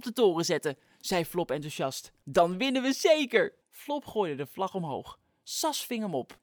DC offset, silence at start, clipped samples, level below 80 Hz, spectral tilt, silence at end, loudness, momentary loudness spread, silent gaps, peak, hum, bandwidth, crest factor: under 0.1%; 0 s; under 0.1%; -66 dBFS; -4 dB/octave; 0.1 s; -29 LUFS; 12 LU; none; -8 dBFS; none; over 20 kHz; 22 dB